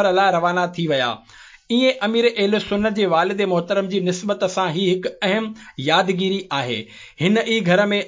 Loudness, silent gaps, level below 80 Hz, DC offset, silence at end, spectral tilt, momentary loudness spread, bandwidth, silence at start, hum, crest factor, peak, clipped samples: -20 LUFS; none; -58 dBFS; under 0.1%; 0 s; -5 dB/octave; 6 LU; 7.6 kHz; 0 s; none; 16 dB; -4 dBFS; under 0.1%